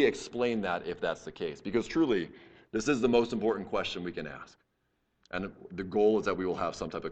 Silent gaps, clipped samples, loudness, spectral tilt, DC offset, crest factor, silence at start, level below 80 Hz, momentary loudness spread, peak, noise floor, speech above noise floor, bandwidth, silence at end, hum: none; under 0.1%; -31 LUFS; -5.5 dB/octave; under 0.1%; 18 dB; 0 s; -58 dBFS; 13 LU; -14 dBFS; -77 dBFS; 46 dB; 8.8 kHz; 0 s; none